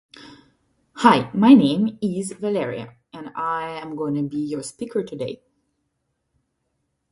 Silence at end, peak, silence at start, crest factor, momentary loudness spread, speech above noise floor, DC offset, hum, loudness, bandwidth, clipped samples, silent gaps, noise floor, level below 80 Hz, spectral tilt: 1.75 s; 0 dBFS; 0.2 s; 22 dB; 19 LU; 54 dB; under 0.1%; none; -21 LUFS; 11.5 kHz; under 0.1%; none; -74 dBFS; -64 dBFS; -6 dB/octave